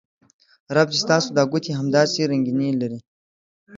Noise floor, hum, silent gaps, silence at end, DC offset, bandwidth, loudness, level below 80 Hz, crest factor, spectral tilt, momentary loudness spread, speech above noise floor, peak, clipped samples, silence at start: under -90 dBFS; none; 3.07-3.67 s; 0 s; under 0.1%; 7.8 kHz; -20 LUFS; -64 dBFS; 20 dB; -5 dB/octave; 7 LU; over 70 dB; -2 dBFS; under 0.1%; 0.7 s